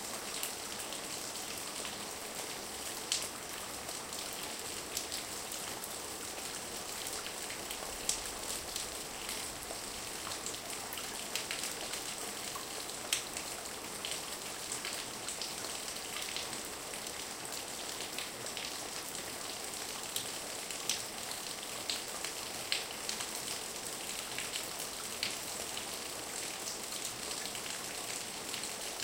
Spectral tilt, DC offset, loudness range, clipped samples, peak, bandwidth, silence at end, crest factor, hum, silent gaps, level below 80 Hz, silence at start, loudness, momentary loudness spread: -0.5 dB/octave; under 0.1%; 2 LU; under 0.1%; -10 dBFS; 17 kHz; 0 s; 30 dB; none; none; -64 dBFS; 0 s; -38 LUFS; 4 LU